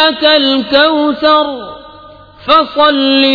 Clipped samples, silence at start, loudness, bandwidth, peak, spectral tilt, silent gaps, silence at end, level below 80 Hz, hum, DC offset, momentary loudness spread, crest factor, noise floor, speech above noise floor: 0.1%; 0 s; -9 LUFS; 5.4 kHz; 0 dBFS; -5 dB/octave; none; 0 s; -46 dBFS; none; under 0.1%; 14 LU; 10 dB; -36 dBFS; 26 dB